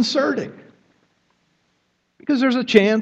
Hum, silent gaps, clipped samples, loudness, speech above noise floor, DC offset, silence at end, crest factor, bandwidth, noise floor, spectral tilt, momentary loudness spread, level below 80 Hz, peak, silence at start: none; none; under 0.1%; -19 LUFS; 50 dB; under 0.1%; 0 s; 20 dB; 8.4 kHz; -68 dBFS; -5 dB/octave; 16 LU; -66 dBFS; 0 dBFS; 0 s